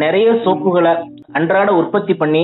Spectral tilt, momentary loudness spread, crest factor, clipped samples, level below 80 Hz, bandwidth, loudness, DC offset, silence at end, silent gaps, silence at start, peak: -10.5 dB/octave; 7 LU; 12 dB; under 0.1%; -64 dBFS; 4.1 kHz; -15 LUFS; under 0.1%; 0 s; none; 0 s; -2 dBFS